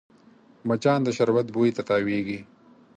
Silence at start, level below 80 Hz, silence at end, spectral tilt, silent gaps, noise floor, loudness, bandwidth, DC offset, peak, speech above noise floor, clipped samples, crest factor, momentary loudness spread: 0.65 s; -64 dBFS; 0.55 s; -6.5 dB/octave; none; -55 dBFS; -24 LUFS; 9.2 kHz; under 0.1%; -8 dBFS; 31 dB; under 0.1%; 18 dB; 11 LU